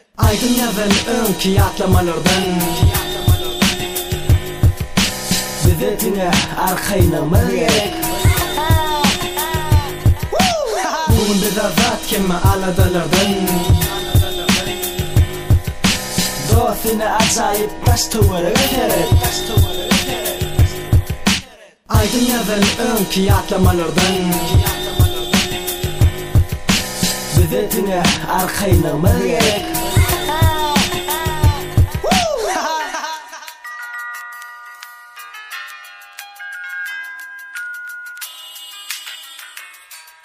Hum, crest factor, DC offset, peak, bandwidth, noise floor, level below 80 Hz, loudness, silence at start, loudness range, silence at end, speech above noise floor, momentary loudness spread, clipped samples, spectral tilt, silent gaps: none; 16 dB; under 0.1%; 0 dBFS; 15.5 kHz; -40 dBFS; -26 dBFS; -16 LUFS; 0.2 s; 13 LU; 0.2 s; 26 dB; 15 LU; under 0.1%; -4.5 dB/octave; none